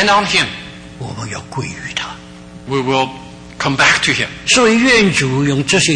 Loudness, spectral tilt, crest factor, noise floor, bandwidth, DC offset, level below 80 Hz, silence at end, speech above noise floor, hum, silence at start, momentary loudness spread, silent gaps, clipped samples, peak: -14 LUFS; -3.5 dB/octave; 14 dB; -35 dBFS; 10.5 kHz; under 0.1%; -42 dBFS; 0 s; 20 dB; none; 0 s; 20 LU; none; under 0.1%; 0 dBFS